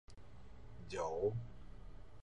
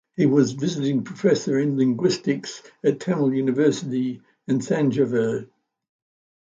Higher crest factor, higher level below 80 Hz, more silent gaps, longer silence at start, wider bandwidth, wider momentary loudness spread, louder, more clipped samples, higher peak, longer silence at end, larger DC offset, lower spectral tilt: about the same, 20 dB vs 18 dB; first, -58 dBFS vs -66 dBFS; neither; second, 0.05 s vs 0.2 s; first, 9.8 kHz vs 8.6 kHz; first, 22 LU vs 7 LU; second, -42 LUFS vs -22 LUFS; neither; second, -26 dBFS vs -6 dBFS; second, 0 s vs 1.05 s; first, 0.2% vs under 0.1%; about the same, -6.5 dB/octave vs -6.5 dB/octave